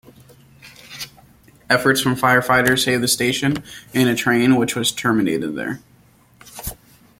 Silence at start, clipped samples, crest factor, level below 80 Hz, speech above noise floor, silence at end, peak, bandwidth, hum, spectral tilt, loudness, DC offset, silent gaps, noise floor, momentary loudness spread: 0.65 s; under 0.1%; 18 dB; -50 dBFS; 35 dB; 0.45 s; -2 dBFS; 16.5 kHz; none; -4 dB/octave; -18 LUFS; under 0.1%; none; -53 dBFS; 18 LU